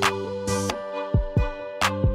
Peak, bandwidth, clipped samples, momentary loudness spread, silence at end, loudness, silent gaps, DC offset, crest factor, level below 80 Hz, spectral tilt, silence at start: -8 dBFS; 16 kHz; under 0.1%; 6 LU; 0 s; -26 LUFS; none; under 0.1%; 18 dB; -32 dBFS; -5 dB/octave; 0 s